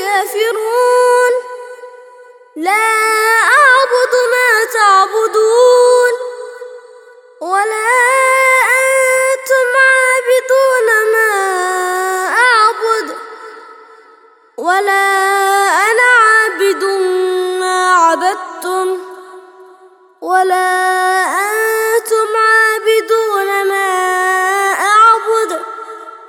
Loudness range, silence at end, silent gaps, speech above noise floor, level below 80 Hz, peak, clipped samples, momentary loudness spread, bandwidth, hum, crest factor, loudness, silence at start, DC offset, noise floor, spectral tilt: 5 LU; 0 s; none; 32 dB; -74 dBFS; 0 dBFS; under 0.1%; 11 LU; 19 kHz; none; 12 dB; -11 LUFS; 0 s; under 0.1%; -45 dBFS; 1 dB/octave